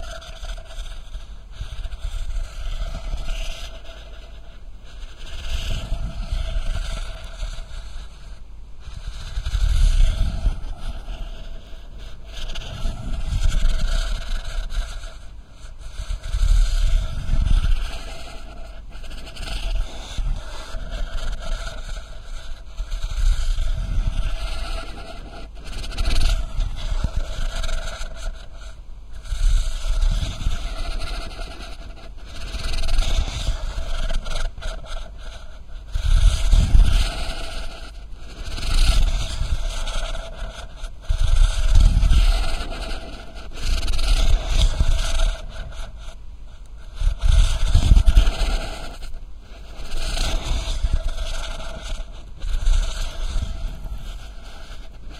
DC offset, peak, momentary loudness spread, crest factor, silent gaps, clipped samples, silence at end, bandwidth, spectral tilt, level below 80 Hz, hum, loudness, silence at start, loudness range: 0.4%; 0 dBFS; 19 LU; 20 dB; none; under 0.1%; 0 s; 11.5 kHz; -4.5 dB/octave; -22 dBFS; none; -27 LUFS; 0 s; 10 LU